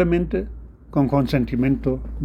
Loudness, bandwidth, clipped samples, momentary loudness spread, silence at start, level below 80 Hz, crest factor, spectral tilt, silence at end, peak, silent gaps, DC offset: -22 LUFS; 14.5 kHz; under 0.1%; 9 LU; 0 s; -34 dBFS; 16 dB; -9 dB/octave; 0 s; -4 dBFS; none; under 0.1%